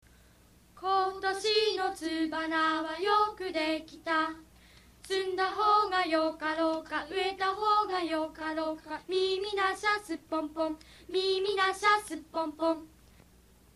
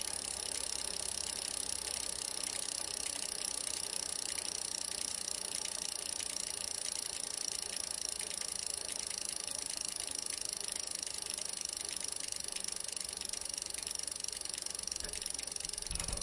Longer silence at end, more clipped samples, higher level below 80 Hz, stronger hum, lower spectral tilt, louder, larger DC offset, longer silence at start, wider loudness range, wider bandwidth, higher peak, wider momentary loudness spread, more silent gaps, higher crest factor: first, 0.9 s vs 0 s; neither; about the same, -64 dBFS vs -60 dBFS; neither; first, -2.5 dB/octave vs 0.5 dB/octave; first, -30 LUFS vs -37 LUFS; neither; first, 0.75 s vs 0 s; about the same, 2 LU vs 2 LU; first, 13.5 kHz vs 11.5 kHz; first, -12 dBFS vs -18 dBFS; first, 9 LU vs 2 LU; neither; about the same, 18 dB vs 22 dB